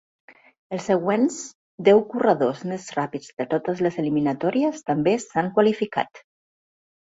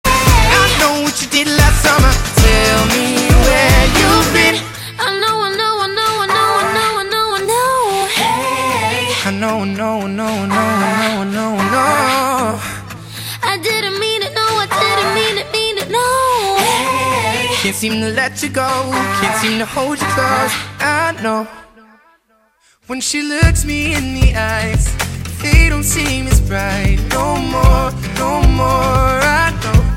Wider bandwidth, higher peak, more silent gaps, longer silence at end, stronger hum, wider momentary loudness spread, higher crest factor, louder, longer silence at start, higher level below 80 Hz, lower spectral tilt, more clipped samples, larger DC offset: second, 8 kHz vs 16.5 kHz; second, -4 dBFS vs 0 dBFS; first, 1.55-1.78 s, 3.33-3.37 s vs none; first, 0.85 s vs 0 s; neither; first, 13 LU vs 8 LU; first, 20 dB vs 14 dB; second, -23 LUFS vs -14 LUFS; first, 0.7 s vs 0.05 s; second, -66 dBFS vs -20 dBFS; first, -6 dB/octave vs -4 dB/octave; neither; neither